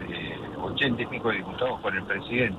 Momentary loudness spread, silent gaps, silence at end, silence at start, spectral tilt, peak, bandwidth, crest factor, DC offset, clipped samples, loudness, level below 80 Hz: 8 LU; none; 0 s; 0 s; -7 dB/octave; -12 dBFS; 12.5 kHz; 16 dB; under 0.1%; under 0.1%; -28 LUFS; -52 dBFS